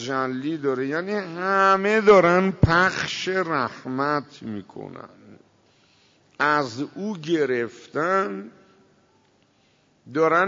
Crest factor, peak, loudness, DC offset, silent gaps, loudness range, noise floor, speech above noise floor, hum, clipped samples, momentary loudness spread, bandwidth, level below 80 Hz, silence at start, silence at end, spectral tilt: 18 dB; -6 dBFS; -22 LUFS; under 0.1%; none; 9 LU; -62 dBFS; 40 dB; none; under 0.1%; 18 LU; 7.6 kHz; -46 dBFS; 0 s; 0 s; -6 dB/octave